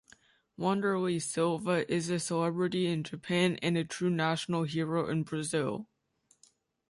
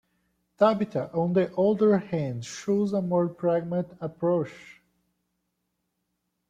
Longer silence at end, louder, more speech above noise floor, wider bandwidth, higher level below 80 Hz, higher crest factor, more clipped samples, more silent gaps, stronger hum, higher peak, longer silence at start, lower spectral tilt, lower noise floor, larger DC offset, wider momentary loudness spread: second, 1.05 s vs 1.75 s; second, -31 LUFS vs -26 LUFS; second, 40 dB vs 53 dB; first, 11.5 kHz vs 9.2 kHz; about the same, -70 dBFS vs -68 dBFS; about the same, 18 dB vs 20 dB; neither; neither; neither; second, -14 dBFS vs -8 dBFS; about the same, 0.6 s vs 0.6 s; second, -5.5 dB/octave vs -7.5 dB/octave; second, -71 dBFS vs -79 dBFS; neither; second, 4 LU vs 9 LU